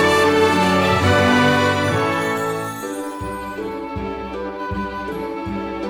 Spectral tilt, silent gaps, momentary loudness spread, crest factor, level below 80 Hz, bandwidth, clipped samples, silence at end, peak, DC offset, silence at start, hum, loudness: -5 dB/octave; none; 13 LU; 16 dB; -42 dBFS; 18 kHz; under 0.1%; 0 s; -2 dBFS; under 0.1%; 0 s; none; -19 LUFS